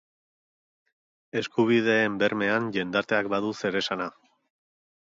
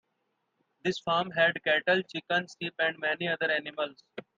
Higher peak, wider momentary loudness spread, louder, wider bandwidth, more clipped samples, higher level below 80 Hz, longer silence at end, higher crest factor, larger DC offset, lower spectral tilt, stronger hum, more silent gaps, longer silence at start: first, -8 dBFS vs -12 dBFS; about the same, 10 LU vs 11 LU; first, -26 LUFS vs -29 LUFS; about the same, 7.8 kHz vs 7.8 kHz; neither; first, -68 dBFS vs -76 dBFS; first, 1 s vs 0.15 s; about the same, 20 dB vs 20 dB; neither; about the same, -5.5 dB/octave vs -4.5 dB/octave; neither; neither; first, 1.35 s vs 0.85 s